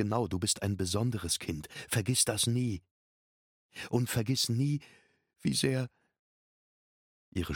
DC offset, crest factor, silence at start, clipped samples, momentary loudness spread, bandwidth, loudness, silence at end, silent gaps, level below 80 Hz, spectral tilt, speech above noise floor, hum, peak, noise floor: under 0.1%; 20 dB; 0 s; under 0.1%; 13 LU; 17.5 kHz; -31 LUFS; 0 s; 2.91-3.69 s, 6.19-7.32 s; -58 dBFS; -4 dB/octave; over 59 dB; none; -14 dBFS; under -90 dBFS